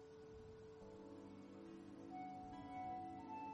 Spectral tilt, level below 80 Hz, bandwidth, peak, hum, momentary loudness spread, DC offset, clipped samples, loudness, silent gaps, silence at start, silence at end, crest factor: -7 dB/octave; -76 dBFS; 11 kHz; -42 dBFS; none; 9 LU; under 0.1%; under 0.1%; -55 LUFS; none; 0 s; 0 s; 12 dB